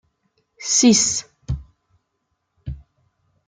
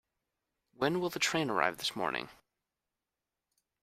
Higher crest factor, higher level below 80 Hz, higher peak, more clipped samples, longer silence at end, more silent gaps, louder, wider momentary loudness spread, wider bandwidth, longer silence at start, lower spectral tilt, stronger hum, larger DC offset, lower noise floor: second, 20 dB vs 26 dB; first, -42 dBFS vs -74 dBFS; first, -4 dBFS vs -10 dBFS; neither; second, 0.7 s vs 1.5 s; neither; first, -18 LUFS vs -33 LUFS; first, 23 LU vs 7 LU; second, 10 kHz vs 15.5 kHz; second, 0.6 s vs 0.8 s; about the same, -3 dB/octave vs -3.5 dB/octave; neither; neither; second, -74 dBFS vs -90 dBFS